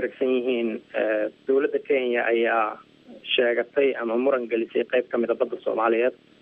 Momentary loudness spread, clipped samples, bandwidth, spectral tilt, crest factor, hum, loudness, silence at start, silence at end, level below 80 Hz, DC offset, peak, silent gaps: 5 LU; under 0.1%; 4.4 kHz; -7 dB/octave; 16 dB; none; -24 LUFS; 0 s; 0.3 s; -78 dBFS; under 0.1%; -8 dBFS; none